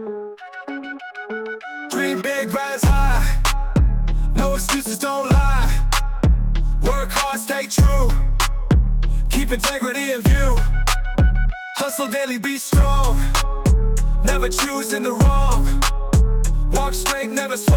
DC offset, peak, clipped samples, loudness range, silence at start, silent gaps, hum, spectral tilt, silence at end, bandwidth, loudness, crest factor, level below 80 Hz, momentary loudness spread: under 0.1%; -6 dBFS; under 0.1%; 1 LU; 0 s; none; none; -4.5 dB/octave; 0 s; 18.5 kHz; -20 LUFS; 12 dB; -18 dBFS; 8 LU